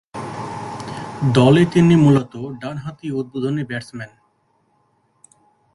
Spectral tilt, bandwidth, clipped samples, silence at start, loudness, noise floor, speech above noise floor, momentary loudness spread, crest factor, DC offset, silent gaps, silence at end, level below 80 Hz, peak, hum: -7.5 dB/octave; 11.5 kHz; under 0.1%; 0.15 s; -18 LUFS; -63 dBFS; 47 dB; 18 LU; 18 dB; under 0.1%; none; 1.7 s; -52 dBFS; -2 dBFS; none